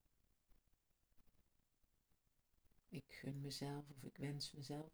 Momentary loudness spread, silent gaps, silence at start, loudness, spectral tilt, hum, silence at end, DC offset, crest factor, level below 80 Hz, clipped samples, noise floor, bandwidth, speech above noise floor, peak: 9 LU; none; 0.5 s; -51 LUFS; -5 dB/octave; none; 0 s; under 0.1%; 18 dB; -78 dBFS; under 0.1%; -82 dBFS; over 20 kHz; 32 dB; -36 dBFS